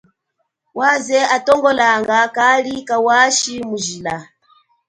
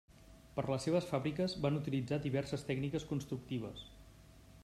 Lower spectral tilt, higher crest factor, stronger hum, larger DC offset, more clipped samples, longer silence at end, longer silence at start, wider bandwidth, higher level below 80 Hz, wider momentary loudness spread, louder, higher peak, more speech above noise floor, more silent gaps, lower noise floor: second, -2 dB/octave vs -6.5 dB/octave; about the same, 16 dB vs 18 dB; neither; neither; neither; first, 0.65 s vs 0 s; first, 0.75 s vs 0.1 s; second, 11 kHz vs 14 kHz; about the same, -58 dBFS vs -62 dBFS; about the same, 11 LU vs 9 LU; first, -15 LUFS vs -38 LUFS; first, 0 dBFS vs -20 dBFS; first, 56 dB vs 22 dB; neither; first, -72 dBFS vs -59 dBFS